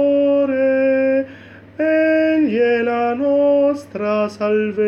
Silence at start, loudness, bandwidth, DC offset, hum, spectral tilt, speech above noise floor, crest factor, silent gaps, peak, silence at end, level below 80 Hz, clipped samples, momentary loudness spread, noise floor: 0 s; -17 LUFS; 8 kHz; under 0.1%; none; -7 dB/octave; 21 dB; 10 dB; none; -6 dBFS; 0 s; -62 dBFS; under 0.1%; 6 LU; -40 dBFS